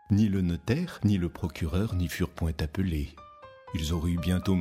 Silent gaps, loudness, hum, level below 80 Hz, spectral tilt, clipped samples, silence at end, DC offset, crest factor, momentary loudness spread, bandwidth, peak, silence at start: none; -29 LUFS; none; -40 dBFS; -7 dB/octave; under 0.1%; 0 s; under 0.1%; 16 dB; 11 LU; 16 kHz; -12 dBFS; 0.1 s